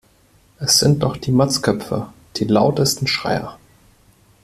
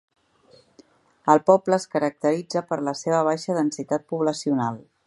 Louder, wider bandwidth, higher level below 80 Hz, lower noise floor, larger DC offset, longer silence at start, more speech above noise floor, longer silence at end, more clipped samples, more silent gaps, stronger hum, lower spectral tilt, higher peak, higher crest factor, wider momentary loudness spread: first, -18 LUFS vs -23 LUFS; first, 15.5 kHz vs 11.5 kHz; first, -48 dBFS vs -72 dBFS; about the same, -54 dBFS vs -57 dBFS; neither; second, 0.6 s vs 1.25 s; about the same, 37 dB vs 34 dB; first, 0.9 s vs 0.3 s; neither; neither; neither; about the same, -4.5 dB/octave vs -5.5 dB/octave; about the same, -2 dBFS vs -2 dBFS; about the same, 18 dB vs 22 dB; first, 12 LU vs 9 LU